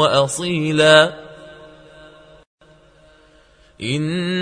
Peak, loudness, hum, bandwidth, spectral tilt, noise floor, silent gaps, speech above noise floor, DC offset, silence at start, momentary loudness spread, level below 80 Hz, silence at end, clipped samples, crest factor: 0 dBFS; -16 LUFS; none; 11 kHz; -4 dB/octave; -51 dBFS; 2.47-2.58 s; 36 dB; under 0.1%; 0 s; 20 LU; -56 dBFS; 0 s; under 0.1%; 20 dB